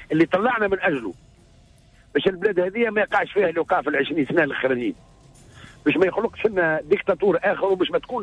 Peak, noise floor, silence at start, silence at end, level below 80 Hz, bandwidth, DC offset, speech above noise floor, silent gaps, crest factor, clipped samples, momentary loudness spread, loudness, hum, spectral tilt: -8 dBFS; -53 dBFS; 0 s; 0 s; -54 dBFS; 10 kHz; under 0.1%; 32 dB; none; 14 dB; under 0.1%; 4 LU; -22 LUFS; none; -7 dB/octave